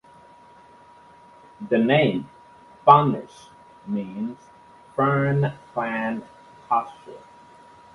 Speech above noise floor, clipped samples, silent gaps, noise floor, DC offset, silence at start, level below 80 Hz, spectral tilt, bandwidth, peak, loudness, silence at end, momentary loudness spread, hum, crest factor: 28 dB; under 0.1%; none; -50 dBFS; under 0.1%; 1.6 s; -62 dBFS; -8 dB/octave; 11 kHz; 0 dBFS; -22 LUFS; 0.75 s; 27 LU; none; 24 dB